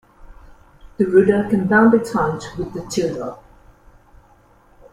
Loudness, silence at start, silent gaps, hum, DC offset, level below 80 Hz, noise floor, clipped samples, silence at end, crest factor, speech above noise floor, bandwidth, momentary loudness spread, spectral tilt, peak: -18 LUFS; 0.2 s; none; none; under 0.1%; -46 dBFS; -52 dBFS; under 0.1%; 1.6 s; 18 dB; 35 dB; 13.5 kHz; 15 LU; -6.5 dB/octave; -2 dBFS